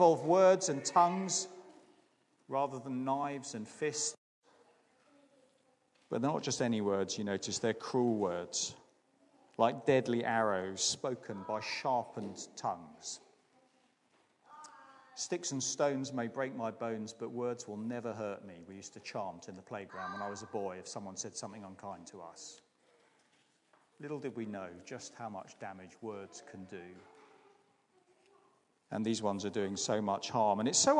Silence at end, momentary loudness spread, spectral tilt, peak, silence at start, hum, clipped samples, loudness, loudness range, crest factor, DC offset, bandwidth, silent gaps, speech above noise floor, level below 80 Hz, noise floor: 0 s; 18 LU; -3.5 dB/octave; -14 dBFS; 0 s; none; under 0.1%; -35 LUFS; 13 LU; 24 dB; under 0.1%; 11 kHz; 4.18-4.42 s; 37 dB; -84 dBFS; -73 dBFS